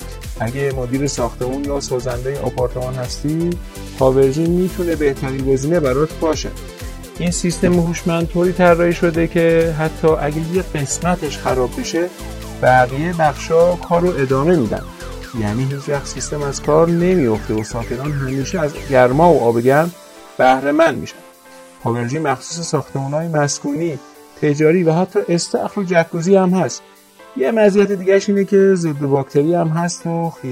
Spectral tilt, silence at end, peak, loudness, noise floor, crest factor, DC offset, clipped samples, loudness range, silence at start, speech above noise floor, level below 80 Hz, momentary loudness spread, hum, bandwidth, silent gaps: -6 dB/octave; 0 s; 0 dBFS; -17 LUFS; -41 dBFS; 16 dB; under 0.1%; under 0.1%; 4 LU; 0 s; 25 dB; -34 dBFS; 10 LU; none; 16 kHz; none